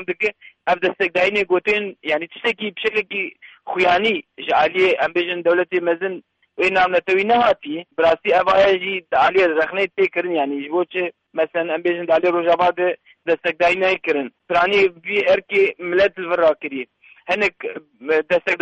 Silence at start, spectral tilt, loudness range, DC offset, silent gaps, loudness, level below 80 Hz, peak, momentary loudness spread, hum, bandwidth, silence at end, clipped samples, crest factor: 0 s; -5 dB/octave; 3 LU; under 0.1%; none; -19 LUFS; -58 dBFS; -6 dBFS; 9 LU; none; 8.4 kHz; 0.05 s; under 0.1%; 14 dB